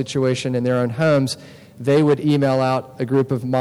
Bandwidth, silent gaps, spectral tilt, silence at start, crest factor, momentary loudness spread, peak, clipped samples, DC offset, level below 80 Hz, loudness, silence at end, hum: 13 kHz; none; -6.5 dB/octave; 0 s; 10 dB; 7 LU; -8 dBFS; under 0.1%; under 0.1%; -60 dBFS; -19 LUFS; 0 s; none